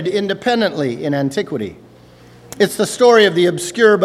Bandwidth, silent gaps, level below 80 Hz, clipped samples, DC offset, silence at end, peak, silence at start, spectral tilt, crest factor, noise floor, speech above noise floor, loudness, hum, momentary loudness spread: 14.5 kHz; none; -58 dBFS; under 0.1%; under 0.1%; 0 s; 0 dBFS; 0 s; -4.5 dB/octave; 16 dB; -43 dBFS; 29 dB; -15 LUFS; 60 Hz at -45 dBFS; 11 LU